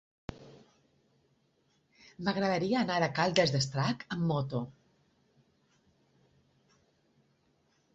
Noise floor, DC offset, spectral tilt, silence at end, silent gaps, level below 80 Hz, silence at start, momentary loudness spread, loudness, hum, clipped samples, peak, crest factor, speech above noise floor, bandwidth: -73 dBFS; under 0.1%; -5.5 dB/octave; 3.25 s; none; -66 dBFS; 0.3 s; 18 LU; -31 LUFS; none; under 0.1%; -8 dBFS; 28 dB; 42 dB; 8 kHz